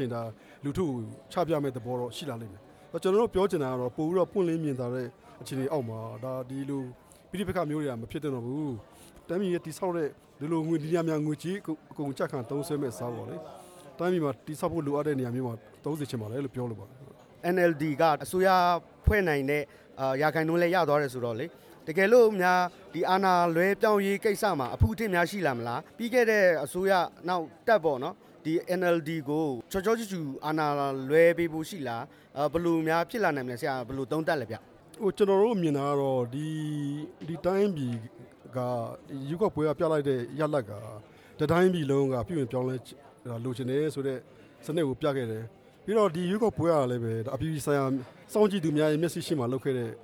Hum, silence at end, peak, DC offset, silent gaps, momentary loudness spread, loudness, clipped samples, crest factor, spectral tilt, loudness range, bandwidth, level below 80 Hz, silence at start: none; 0 s; -10 dBFS; under 0.1%; none; 14 LU; -29 LUFS; under 0.1%; 20 dB; -6.5 dB/octave; 7 LU; 19 kHz; -50 dBFS; 0 s